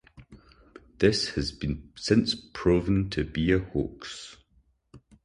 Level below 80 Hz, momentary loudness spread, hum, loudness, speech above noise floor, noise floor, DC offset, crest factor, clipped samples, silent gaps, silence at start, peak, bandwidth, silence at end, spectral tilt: -44 dBFS; 13 LU; none; -27 LUFS; 40 dB; -66 dBFS; under 0.1%; 20 dB; under 0.1%; none; 0.2 s; -8 dBFS; 11 kHz; 0.25 s; -5.5 dB/octave